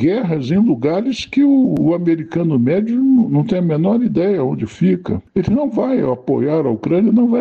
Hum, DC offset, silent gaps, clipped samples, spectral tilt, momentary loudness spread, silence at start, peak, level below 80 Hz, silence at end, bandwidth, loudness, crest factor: none; under 0.1%; none; under 0.1%; -8.5 dB/octave; 5 LU; 0 s; -6 dBFS; -48 dBFS; 0 s; 7.4 kHz; -16 LUFS; 10 dB